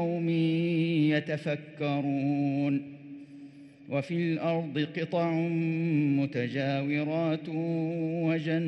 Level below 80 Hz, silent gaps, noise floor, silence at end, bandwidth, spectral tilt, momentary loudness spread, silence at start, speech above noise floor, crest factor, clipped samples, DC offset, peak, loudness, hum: -78 dBFS; none; -49 dBFS; 0 s; 6.2 kHz; -8.5 dB/octave; 7 LU; 0 s; 20 dB; 16 dB; under 0.1%; under 0.1%; -14 dBFS; -29 LUFS; none